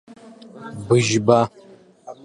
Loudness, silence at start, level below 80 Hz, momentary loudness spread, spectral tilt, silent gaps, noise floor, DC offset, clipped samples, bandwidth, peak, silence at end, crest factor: -18 LUFS; 0.1 s; -58 dBFS; 20 LU; -5.5 dB/octave; none; -43 dBFS; under 0.1%; under 0.1%; 11 kHz; -2 dBFS; 0.1 s; 20 dB